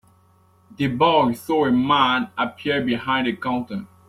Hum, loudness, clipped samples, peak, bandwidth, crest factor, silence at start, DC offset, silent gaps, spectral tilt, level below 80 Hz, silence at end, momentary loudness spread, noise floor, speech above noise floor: none; -20 LUFS; under 0.1%; -4 dBFS; 14.5 kHz; 18 dB; 0.8 s; under 0.1%; none; -6 dB/octave; -56 dBFS; 0.2 s; 9 LU; -57 dBFS; 36 dB